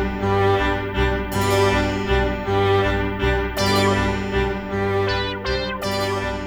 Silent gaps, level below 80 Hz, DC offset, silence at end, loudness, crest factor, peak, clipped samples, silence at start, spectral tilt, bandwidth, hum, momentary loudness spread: none; -30 dBFS; under 0.1%; 0 s; -21 LUFS; 14 dB; -6 dBFS; under 0.1%; 0 s; -5.5 dB/octave; over 20 kHz; none; 5 LU